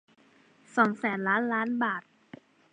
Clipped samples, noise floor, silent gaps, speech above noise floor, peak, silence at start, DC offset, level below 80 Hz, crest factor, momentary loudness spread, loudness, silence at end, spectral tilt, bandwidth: under 0.1%; -61 dBFS; none; 34 dB; -8 dBFS; 0.75 s; under 0.1%; -82 dBFS; 22 dB; 6 LU; -28 LUFS; 0.75 s; -6.5 dB/octave; 9.6 kHz